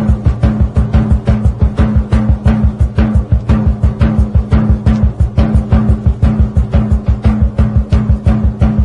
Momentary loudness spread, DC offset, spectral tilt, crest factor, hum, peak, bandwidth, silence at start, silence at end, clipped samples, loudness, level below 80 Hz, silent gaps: 2 LU; under 0.1%; -9.5 dB/octave; 10 dB; none; 0 dBFS; 5.8 kHz; 0 s; 0 s; under 0.1%; -12 LUFS; -14 dBFS; none